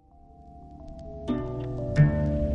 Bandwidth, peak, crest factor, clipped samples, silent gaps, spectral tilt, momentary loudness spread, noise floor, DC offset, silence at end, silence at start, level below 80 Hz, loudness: 7.2 kHz; -8 dBFS; 20 dB; under 0.1%; none; -9.5 dB/octave; 23 LU; -51 dBFS; under 0.1%; 0 s; 0.25 s; -36 dBFS; -27 LUFS